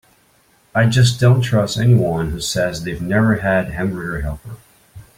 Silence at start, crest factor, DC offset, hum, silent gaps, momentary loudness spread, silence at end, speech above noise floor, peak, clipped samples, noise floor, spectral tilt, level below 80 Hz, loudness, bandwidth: 0.75 s; 16 dB; under 0.1%; none; none; 11 LU; 0.15 s; 39 dB; -2 dBFS; under 0.1%; -56 dBFS; -6 dB/octave; -38 dBFS; -17 LUFS; 15.5 kHz